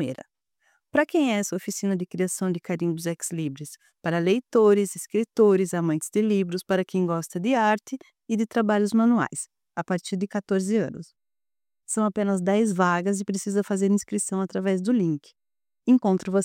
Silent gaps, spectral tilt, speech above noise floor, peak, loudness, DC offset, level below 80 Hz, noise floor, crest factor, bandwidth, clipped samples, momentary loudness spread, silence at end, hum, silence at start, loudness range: none; -5.5 dB/octave; over 66 dB; -8 dBFS; -24 LUFS; under 0.1%; -72 dBFS; under -90 dBFS; 16 dB; 16.5 kHz; under 0.1%; 11 LU; 0 s; none; 0 s; 4 LU